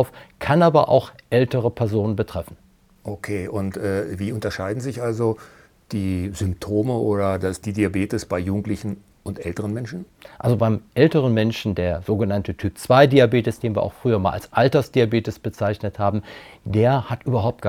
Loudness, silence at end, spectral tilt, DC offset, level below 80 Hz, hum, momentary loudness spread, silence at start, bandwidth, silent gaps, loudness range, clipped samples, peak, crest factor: -21 LUFS; 0 s; -7 dB/octave; under 0.1%; -50 dBFS; none; 13 LU; 0 s; 16 kHz; none; 7 LU; under 0.1%; 0 dBFS; 22 dB